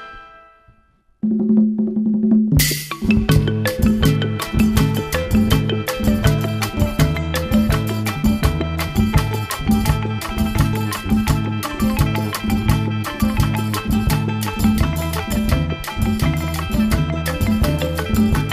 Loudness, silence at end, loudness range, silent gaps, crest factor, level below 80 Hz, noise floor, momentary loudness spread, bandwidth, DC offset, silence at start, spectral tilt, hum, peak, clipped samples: -19 LUFS; 0 s; 3 LU; none; 16 dB; -26 dBFS; -56 dBFS; 6 LU; 15.5 kHz; under 0.1%; 0 s; -6 dB/octave; none; -2 dBFS; under 0.1%